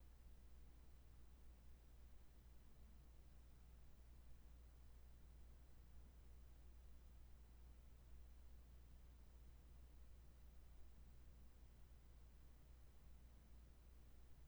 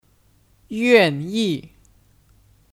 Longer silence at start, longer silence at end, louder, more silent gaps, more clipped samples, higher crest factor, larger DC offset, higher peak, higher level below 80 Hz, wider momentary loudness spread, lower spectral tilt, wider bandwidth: second, 0 s vs 0.7 s; second, 0 s vs 1.1 s; second, -68 LUFS vs -19 LUFS; neither; neither; second, 14 dB vs 22 dB; neither; second, -50 dBFS vs -2 dBFS; second, -64 dBFS vs -58 dBFS; second, 2 LU vs 15 LU; about the same, -5.5 dB/octave vs -5.5 dB/octave; first, over 20 kHz vs 15.5 kHz